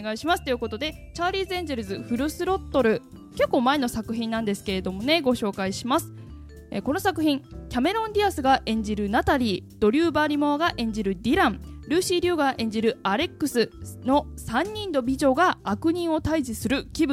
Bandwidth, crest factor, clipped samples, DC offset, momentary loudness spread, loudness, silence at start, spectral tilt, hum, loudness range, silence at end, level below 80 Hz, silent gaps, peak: 16 kHz; 18 dB; under 0.1%; under 0.1%; 8 LU; -25 LUFS; 0 s; -5 dB/octave; none; 3 LU; 0 s; -44 dBFS; none; -6 dBFS